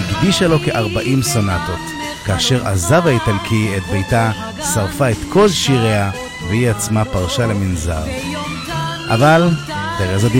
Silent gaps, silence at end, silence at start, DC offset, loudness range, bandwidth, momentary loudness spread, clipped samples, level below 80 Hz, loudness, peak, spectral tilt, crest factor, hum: none; 0 s; 0 s; under 0.1%; 2 LU; 16.5 kHz; 9 LU; under 0.1%; -34 dBFS; -16 LUFS; -2 dBFS; -5 dB/octave; 14 dB; none